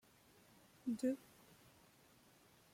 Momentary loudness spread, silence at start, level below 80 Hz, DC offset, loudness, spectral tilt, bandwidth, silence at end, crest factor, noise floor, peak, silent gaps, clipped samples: 26 LU; 0.85 s; -84 dBFS; under 0.1%; -44 LUFS; -5.5 dB/octave; 16.5 kHz; 1.55 s; 20 dB; -69 dBFS; -28 dBFS; none; under 0.1%